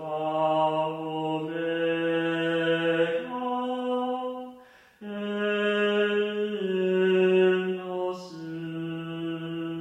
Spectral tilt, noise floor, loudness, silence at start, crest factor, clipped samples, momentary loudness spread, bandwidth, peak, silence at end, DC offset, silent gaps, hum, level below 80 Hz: -7 dB/octave; -52 dBFS; -27 LUFS; 0 s; 14 dB; under 0.1%; 12 LU; 9 kHz; -12 dBFS; 0 s; under 0.1%; none; none; -74 dBFS